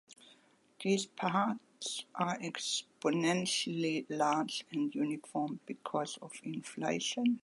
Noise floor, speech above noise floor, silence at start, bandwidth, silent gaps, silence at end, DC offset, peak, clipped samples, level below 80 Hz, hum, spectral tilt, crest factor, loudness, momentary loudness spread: -66 dBFS; 31 dB; 0.2 s; 11.5 kHz; none; 0.05 s; under 0.1%; -18 dBFS; under 0.1%; -84 dBFS; none; -4 dB/octave; 18 dB; -35 LUFS; 9 LU